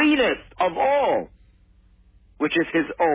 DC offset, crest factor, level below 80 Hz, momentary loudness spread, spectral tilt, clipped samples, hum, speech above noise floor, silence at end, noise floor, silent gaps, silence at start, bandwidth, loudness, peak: under 0.1%; 14 dB; -52 dBFS; 7 LU; -8.5 dB/octave; under 0.1%; none; 33 dB; 0 s; -55 dBFS; none; 0 s; 4 kHz; -22 LUFS; -8 dBFS